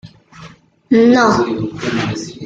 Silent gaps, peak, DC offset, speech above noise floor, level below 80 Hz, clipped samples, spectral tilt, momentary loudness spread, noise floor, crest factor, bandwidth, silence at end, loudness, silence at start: none; -2 dBFS; under 0.1%; 26 dB; -48 dBFS; under 0.1%; -5.5 dB/octave; 10 LU; -40 dBFS; 14 dB; 7.8 kHz; 0 s; -14 LUFS; 0.05 s